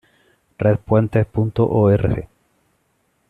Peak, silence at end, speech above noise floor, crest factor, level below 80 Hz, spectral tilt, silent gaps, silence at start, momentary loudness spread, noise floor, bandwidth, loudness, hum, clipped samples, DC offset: -4 dBFS; 1.05 s; 49 dB; 16 dB; -42 dBFS; -10.5 dB/octave; none; 0.6 s; 6 LU; -65 dBFS; 4.2 kHz; -18 LUFS; none; under 0.1%; under 0.1%